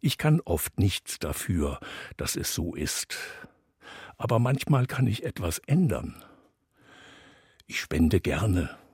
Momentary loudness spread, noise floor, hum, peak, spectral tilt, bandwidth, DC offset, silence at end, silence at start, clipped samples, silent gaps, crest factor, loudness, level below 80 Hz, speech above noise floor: 14 LU; -63 dBFS; none; -10 dBFS; -5.5 dB/octave; 16.5 kHz; under 0.1%; 0.15 s; 0.05 s; under 0.1%; none; 20 dB; -28 LUFS; -46 dBFS; 36 dB